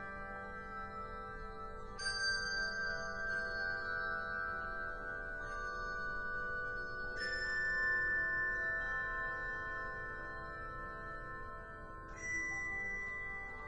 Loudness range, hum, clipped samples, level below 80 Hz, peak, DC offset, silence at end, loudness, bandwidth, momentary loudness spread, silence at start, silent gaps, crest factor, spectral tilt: 6 LU; none; under 0.1%; -54 dBFS; -26 dBFS; under 0.1%; 0 s; -39 LUFS; 10.5 kHz; 12 LU; 0 s; none; 14 dB; -2.5 dB/octave